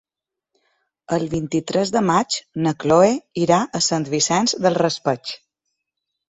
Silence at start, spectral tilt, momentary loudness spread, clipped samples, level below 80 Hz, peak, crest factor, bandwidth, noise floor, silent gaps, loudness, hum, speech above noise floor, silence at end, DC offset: 1.1 s; -4 dB/octave; 8 LU; under 0.1%; -56 dBFS; -2 dBFS; 18 dB; 8.2 kHz; -86 dBFS; none; -19 LUFS; none; 67 dB; 0.95 s; under 0.1%